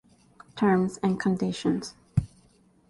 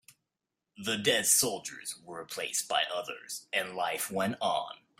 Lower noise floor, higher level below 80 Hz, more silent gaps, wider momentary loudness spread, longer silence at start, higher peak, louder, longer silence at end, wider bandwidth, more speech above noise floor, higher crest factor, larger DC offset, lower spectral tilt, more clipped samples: second, -61 dBFS vs -87 dBFS; first, -48 dBFS vs -76 dBFS; neither; second, 9 LU vs 16 LU; second, 0.55 s vs 0.8 s; about the same, -10 dBFS vs -12 dBFS; first, -27 LUFS vs -30 LUFS; first, 0.65 s vs 0.25 s; second, 11.5 kHz vs 16 kHz; second, 36 dB vs 55 dB; about the same, 18 dB vs 22 dB; neither; first, -7 dB/octave vs -1.5 dB/octave; neither